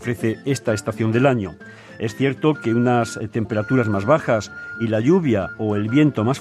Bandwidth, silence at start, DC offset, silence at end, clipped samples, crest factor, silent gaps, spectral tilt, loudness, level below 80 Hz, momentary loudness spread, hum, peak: 13.5 kHz; 0 s; under 0.1%; 0 s; under 0.1%; 18 dB; none; -7 dB/octave; -20 LUFS; -58 dBFS; 10 LU; none; -2 dBFS